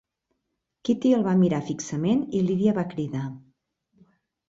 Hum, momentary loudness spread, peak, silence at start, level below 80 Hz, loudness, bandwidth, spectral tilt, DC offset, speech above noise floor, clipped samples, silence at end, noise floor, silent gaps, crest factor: none; 10 LU; -10 dBFS; 0.85 s; -62 dBFS; -24 LUFS; 7.8 kHz; -7 dB/octave; under 0.1%; 56 dB; under 0.1%; 1.1 s; -80 dBFS; none; 16 dB